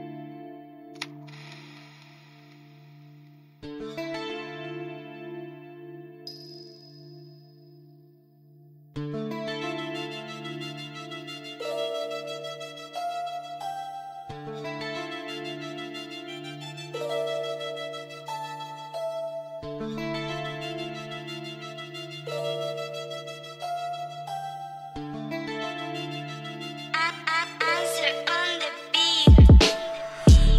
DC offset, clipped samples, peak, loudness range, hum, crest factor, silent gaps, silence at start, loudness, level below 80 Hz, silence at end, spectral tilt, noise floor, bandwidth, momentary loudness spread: under 0.1%; under 0.1%; -6 dBFS; 16 LU; none; 20 dB; none; 0 s; -28 LUFS; -30 dBFS; 0 s; -5.5 dB/octave; -56 dBFS; 14 kHz; 18 LU